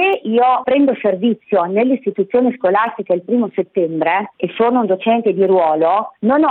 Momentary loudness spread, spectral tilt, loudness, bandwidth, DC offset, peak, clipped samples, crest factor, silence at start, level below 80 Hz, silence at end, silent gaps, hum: 5 LU; -9.5 dB/octave; -16 LUFS; 4.2 kHz; under 0.1%; -2 dBFS; under 0.1%; 12 dB; 0 s; -62 dBFS; 0 s; none; none